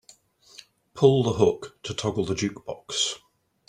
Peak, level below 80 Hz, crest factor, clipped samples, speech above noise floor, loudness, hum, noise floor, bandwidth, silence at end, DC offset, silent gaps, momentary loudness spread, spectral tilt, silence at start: -4 dBFS; -58 dBFS; 22 dB; under 0.1%; 32 dB; -25 LUFS; none; -56 dBFS; 11 kHz; 0.5 s; under 0.1%; none; 14 LU; -5 dB/octave; 0.95 s